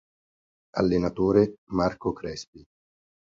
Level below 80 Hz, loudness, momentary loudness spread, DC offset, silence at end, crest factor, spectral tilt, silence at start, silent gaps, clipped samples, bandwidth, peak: -50 dBFS; -26 LUFS; 14 LU; under 0.1%; 0.65 s; 20 dB; -7 dB/octave; 0.75 s; 1.58-1.67 s, 2.47-2.53 s; under 0.1%; 7.6 kHz; -6 dBFS